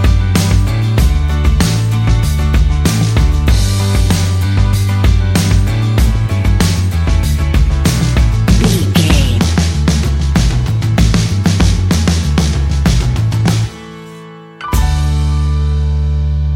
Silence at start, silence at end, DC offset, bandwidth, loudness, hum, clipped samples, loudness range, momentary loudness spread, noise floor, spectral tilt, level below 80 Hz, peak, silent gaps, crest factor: 0 s; 0 s; under 0.1%; 17 kHz; -13 LUFS; none; under 0.1%; 3 LU; 3 LU; -32 dBFS; -5.5 dB/octave; -14 dBFS; 0 dBFS; none; 12 dB